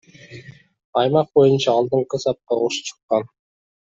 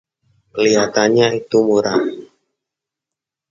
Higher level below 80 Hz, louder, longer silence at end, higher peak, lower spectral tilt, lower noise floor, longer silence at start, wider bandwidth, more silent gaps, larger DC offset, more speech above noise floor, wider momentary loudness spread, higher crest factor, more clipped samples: about the same, -62 dBFS vs -58 dBFS; second, -19 LUFS vs -15 LUFS; second, 0.7 s vs 1.25 s; second, -4 dBFS vs 0 dBFS; about the same, -5.5 dB/octave vs -4.5 dB/octave; second, -42 dBFS vs -85 dBFS; second, 0.3 s vs 0.55 s; about the same, 7.8 kHz vs 7.4 kHz; first, 0.84-0.93 s, 3.03-3.09 s vs none; neither; second, 23 dB vs 70 dB; about the same, 14 LU vs 12 LU; about the same, 18 dB vs 18 dB; neither